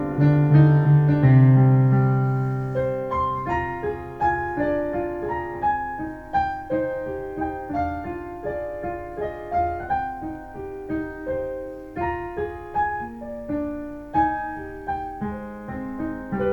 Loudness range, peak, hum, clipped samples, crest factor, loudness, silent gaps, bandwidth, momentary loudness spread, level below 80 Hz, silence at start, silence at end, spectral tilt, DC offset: 10 LU; -4 dBFS; none; under 0.1%; 18 dB; -23 LUFS; none; 4.4 kHz; 16 LU; -44 dBFS; 0 s; 0 s; -10.5 dB/octave; under 0.1%